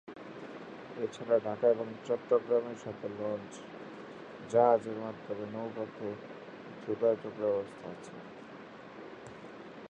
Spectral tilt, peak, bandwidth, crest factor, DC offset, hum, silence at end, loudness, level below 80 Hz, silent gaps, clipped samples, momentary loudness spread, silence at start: -6.5 dB/octave; -12 dBFS; 8.8 kHz; 22 dB; under 0.1%; none; 0 s; -33 LUFS; -76 dBFS; none; under 0.1%; 19 LU; 0.05 s